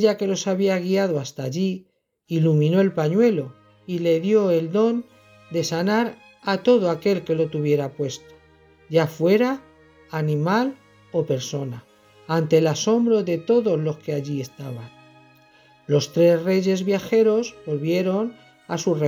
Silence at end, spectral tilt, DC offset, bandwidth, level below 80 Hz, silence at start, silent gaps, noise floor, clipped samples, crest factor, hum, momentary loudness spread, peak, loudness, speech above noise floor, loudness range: 0 s; -6.5 dB/octave; under 0.1%; 20 kHz; -68 dBFS; 0 s; none; -54 dBFS; under 0.1%; 16 dB; none; 11 LU; -6 dBFS; -22 LUFS; 34 dB; 3 LU